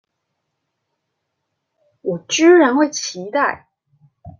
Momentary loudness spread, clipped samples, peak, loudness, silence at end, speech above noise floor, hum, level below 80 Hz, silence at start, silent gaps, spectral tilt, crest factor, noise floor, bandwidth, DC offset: 16 LU; under 0.1%; -2 dBFS; -16 LUFS; 0.1 s; 60 dB; none; -64 dBFS; 2.05 s; none; -3.5 dB/octave; 16 dB; -75 dBFS; 7.2 kHz; under 0.1%